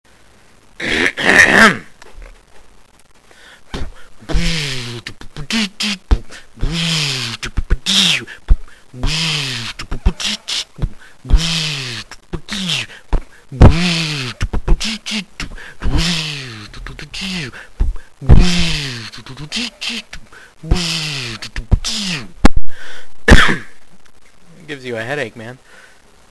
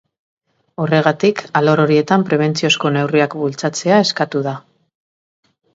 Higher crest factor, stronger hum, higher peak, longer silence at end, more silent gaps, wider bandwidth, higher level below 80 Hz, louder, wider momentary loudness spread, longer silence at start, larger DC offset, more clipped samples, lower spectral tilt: about the same, 16 dB vs 16 dB; neither; about the same, 0 dBFS vs 0 dBFS; second, 0.75 s vs 1.15 s; neither; first, 12 kHz vs 8 kHz; first, -22 dBFS vs -62 dBFS; about the same, -16 LUFS vs -16 LUFS; first, 20 LU vs 8 LU; about the same, 0.8 s vs 0.8 s; neither; first, 0.2% vs under 0.1%; second, -4 dB/octave vs -5.5 dB/octave